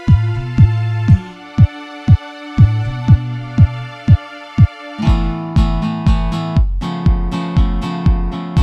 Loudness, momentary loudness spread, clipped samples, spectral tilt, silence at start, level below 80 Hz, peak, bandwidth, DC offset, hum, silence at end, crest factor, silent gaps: -16 LUFS; 6 LU; under 0.1%; -8.5 dB/octave; 0 s; -20 dBFS; 0 dBFS; 8.2 kHz; under 0.1%; none; 0 s; 14 dB; none